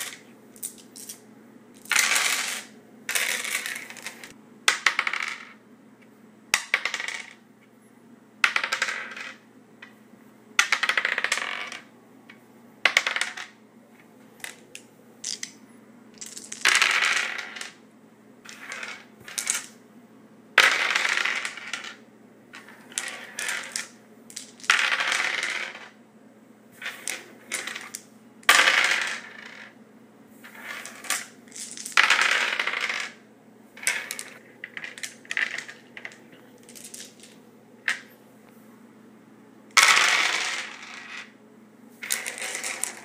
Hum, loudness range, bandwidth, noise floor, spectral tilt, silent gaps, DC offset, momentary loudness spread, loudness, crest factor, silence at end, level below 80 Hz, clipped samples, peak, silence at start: none; 10 LU; 16 kHz; -54 dBFS; 1.5 dB/octave; none; under 0.1%; 23 LU; -24 LUFS; 30 dB; 0 s; -80 dBFS; under 0.1%; 0 dBFS; 0 s